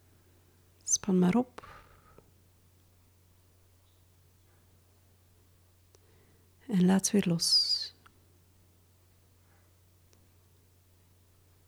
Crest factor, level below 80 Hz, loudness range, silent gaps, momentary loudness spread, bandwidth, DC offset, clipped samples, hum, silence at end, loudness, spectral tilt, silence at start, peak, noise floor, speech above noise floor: 20 dB; -70 dBFS; 8 LU; none; 21 LU; 16 kHz; under 0.1%; under 0.1%; none; 3.8 s; -28 LUFS; -4 dB/octave; 0.85 s; -16 dBFS; -64 dBFS; 37 dB